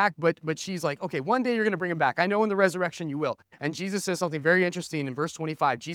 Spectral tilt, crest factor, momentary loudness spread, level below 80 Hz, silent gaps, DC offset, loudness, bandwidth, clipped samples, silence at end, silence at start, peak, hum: -5 dB/octave; 20 dB; 8 LU; -74 dBFS; none; under 0.1%; -27 LUFS; 17.5 kHz; under 0.1%; 0 s; 0 s; -6 dBFS; none